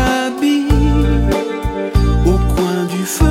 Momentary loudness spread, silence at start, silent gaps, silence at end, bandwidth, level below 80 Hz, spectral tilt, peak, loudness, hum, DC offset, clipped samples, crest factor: 5 LU; 0 s; none; 0 s; 16 kHz; -18 dBFS; -6 dB/octave; -2 dBFS; -15 LUFS; none; under 0.1%; under 0.1%; 12 dB